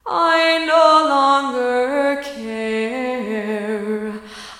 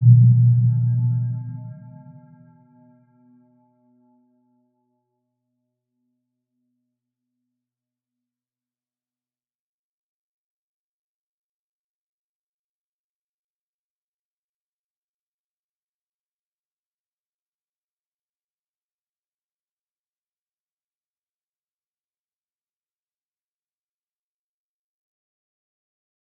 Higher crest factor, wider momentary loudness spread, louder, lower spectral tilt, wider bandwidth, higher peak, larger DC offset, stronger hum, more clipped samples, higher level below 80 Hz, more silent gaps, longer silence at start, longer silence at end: second, 18 dB vs 24 dB; second, 13 LU vs 24 LU; about the same, -17 LUFS vs -17 LUFS; second, -4 dB/octave vs -16.5 dB/octave; first, 15 kHz vs 0.9 kHz; about the same, 0 dBFS vs -2 dBFS; neither; neither; neither; first, -58 dBFS vs -74 dBFS; neither; about the same, 0.05 s vs 0 s; second, 0 s vs 24.5 s